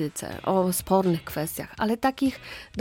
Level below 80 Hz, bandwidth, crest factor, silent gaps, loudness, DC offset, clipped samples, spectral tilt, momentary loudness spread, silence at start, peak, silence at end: -52 dBFS; 17 kHz; 16 dB; none; -26 LUFS; under 0.1%; under 0.1%; -5.5 dB/octave; 9 LU; 0 s; -10 dBFS; 0 s